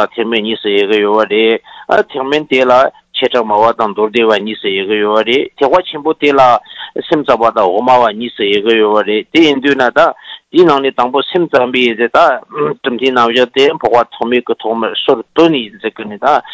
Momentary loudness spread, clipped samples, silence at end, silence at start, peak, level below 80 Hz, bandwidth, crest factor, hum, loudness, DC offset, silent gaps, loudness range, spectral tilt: 7 LU; 0.5%; 0 s; 0 s; 0 dBFS; -54 dBFS; 8 kHz; 12 dB; none; -11 LUFS; under 0.1%; none; 1 LU; -5 dB/octave